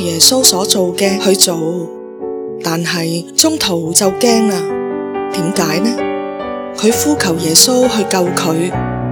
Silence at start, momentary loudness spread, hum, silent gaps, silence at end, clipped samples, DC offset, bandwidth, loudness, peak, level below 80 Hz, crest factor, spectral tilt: 0 s; 13 LU; none; none; 0 s; 0.3%; under 0.1%; over 20 kHz; -13 LUFS; 0 dBFS; -44 dBFS; 14 dB; -3 dB/octave